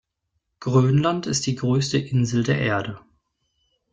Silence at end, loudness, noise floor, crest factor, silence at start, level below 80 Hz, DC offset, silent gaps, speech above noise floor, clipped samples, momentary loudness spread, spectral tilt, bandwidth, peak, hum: 0.95 s; -22 LUFS; -76 dBFS; 18 dB; 0.6 s; -56 dBFS; under 0.1%; none; 55 dB; under 0.1%; 10 LU; -5.5 dB/octave; 9.2 kHz; -4 dBFS; none